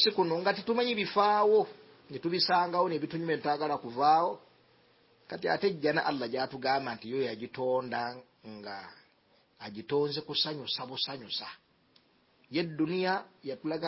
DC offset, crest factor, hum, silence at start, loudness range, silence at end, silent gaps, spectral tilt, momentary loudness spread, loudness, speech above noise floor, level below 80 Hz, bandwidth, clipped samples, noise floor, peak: under 0.1%; 18 dB; none; 0 s; 7 LU; 0 s; none; -8 dB/octave; 17 LU; -30 LUFS; 37 dB; -76 dBFS; 5.8 kHz; under 0.1%; -67 dBFS; -12 dBFS